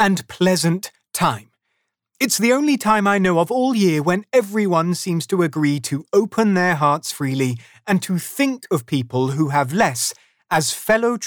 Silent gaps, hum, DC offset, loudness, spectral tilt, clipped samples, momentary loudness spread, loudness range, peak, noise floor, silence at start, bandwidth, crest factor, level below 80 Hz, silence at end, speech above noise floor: none; none; under 0.1%; -19 LUFS; -5 dB/octave; under 0.1%; 7 LU; 3 LU; -4 dBFS; -73 dBFS; 0 s; over 20 kHz; 14 dB; -58 dBFS; 0 s; 55 dB